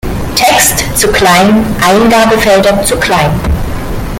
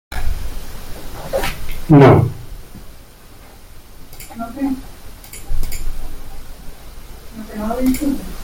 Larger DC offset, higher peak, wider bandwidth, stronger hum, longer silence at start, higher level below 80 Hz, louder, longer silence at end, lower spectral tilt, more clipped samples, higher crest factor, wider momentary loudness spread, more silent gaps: neither; about the same, 0 dBFS vs -2 dBFS; first, over 20 kHz vs 17 kHz; neither; about the same, 0.05 s vs 0.1 s; about the same, -22 dBFS vs -26 dBFS; first, -8 LUFS vs -17 LUFS; about the same, 0 s vs 0 s; second, -3.5 dB/octave vs -7 dB/octave; first, 0.2% vs under 0.1%; second, 8 dB vs 16 dB; second, 8 LU vs 28 LU; neither